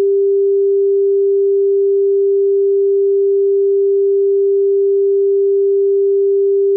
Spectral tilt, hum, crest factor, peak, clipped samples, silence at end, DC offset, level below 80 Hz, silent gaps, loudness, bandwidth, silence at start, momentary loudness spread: -13.5 dB/octave; none; 4 dB; -10 dBFS; under 0.1%; 0 s; under 0.1%; under -90 dBFS; none; -13 LUFS; 0.5 kHz; 0 s; 0 LU